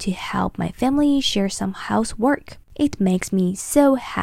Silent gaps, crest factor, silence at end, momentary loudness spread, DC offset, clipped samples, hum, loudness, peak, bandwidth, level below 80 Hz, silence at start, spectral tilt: none; 18 dB; 0 s; 7 LU; under 0.1%; under 0.1%; none; -21 LUFS; -2 dBFS; 15.5 kHz; -44 dBFS; 0 s; -5 dB/octave